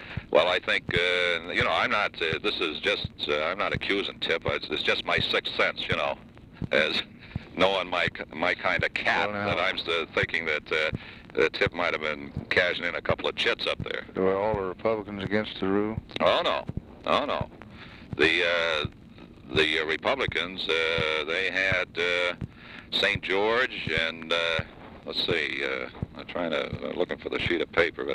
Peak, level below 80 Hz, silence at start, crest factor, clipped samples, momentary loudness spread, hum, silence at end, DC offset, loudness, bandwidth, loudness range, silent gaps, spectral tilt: -8 dBFS; -50 dBFS; 0 s; 20 dB; under 0.1%; 9 LU; none; 0 s; under 0.1%; -26 LUFS; 12.5 kHz; 2 LU; none; -4.5 dB/octave